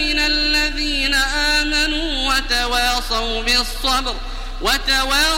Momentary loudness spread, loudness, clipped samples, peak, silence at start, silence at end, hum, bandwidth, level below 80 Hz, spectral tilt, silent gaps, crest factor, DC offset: 5 LU; -17 LUFS; under 0.1%; -2 dBFS; 0 s; 0 s; none; 16.5 kHz; -26 dBFS; -1.5 dB/octave; none; 16 dB; under 0.1%